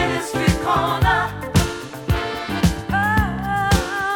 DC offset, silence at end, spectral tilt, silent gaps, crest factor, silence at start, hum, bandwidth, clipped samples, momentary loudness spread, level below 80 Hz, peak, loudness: under 0.1%; 0 s; -5 dB/octave; none; 18 dB; 0 s; none; 19.5 kHz; under 0.1%; 6 LU; -30 dBFS; -2 dBFS; -20 LUFS